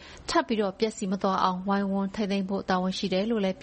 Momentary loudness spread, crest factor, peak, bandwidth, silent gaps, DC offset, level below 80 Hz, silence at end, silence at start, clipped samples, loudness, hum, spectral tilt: 4 LU; 20 dB; -8 dBFS; 8.8 kHz; none; under 0.1%; -56 dBFS; 0 s; 0 s; under 0.1%; -28 LUFS; none; -5.5 dB/octave